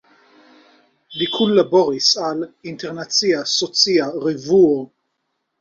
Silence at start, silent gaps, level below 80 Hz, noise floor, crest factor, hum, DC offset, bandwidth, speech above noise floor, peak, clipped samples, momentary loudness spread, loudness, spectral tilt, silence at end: 1.1 s; none; -64 dBFS; -73 dBFS; 18 dB; none; under 0.1%; 7.6 kHz; 56 dB; -2 dBFS; under 0.1%; 15 LU; -17 LUFS; -3.5 dB/octave; 0.75 s